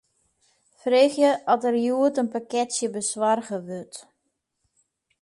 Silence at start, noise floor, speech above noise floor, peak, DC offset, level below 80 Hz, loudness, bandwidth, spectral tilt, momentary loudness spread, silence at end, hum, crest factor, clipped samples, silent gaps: 0.85 s; -77 dBFS; 54 dB; -6 dBFS; under 0.1%; -76 dBFS; -23 LUFS; 11.5 kHz; -3.5 dB/octave; 15 LU; 1.2 s; none; 18 dB; under 0.1%; none